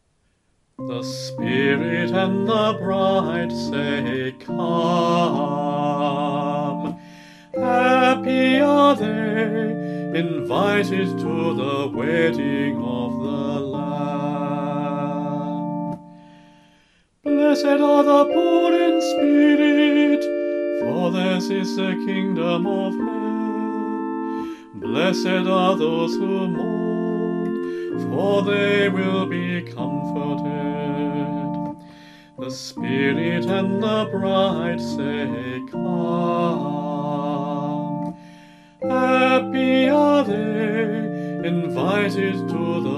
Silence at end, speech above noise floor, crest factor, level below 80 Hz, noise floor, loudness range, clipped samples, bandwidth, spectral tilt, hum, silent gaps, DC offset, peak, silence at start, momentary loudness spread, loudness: 0 s; 45 dB; 18 dB; -62 dBFS; -65 dBFS; 6 LU; under 0.1%; 12.5 kHz; -6.5 dB/octave; none; none; under 0.1%; -2 dBFS; 0.8 s; 11 LU; -21 LUFS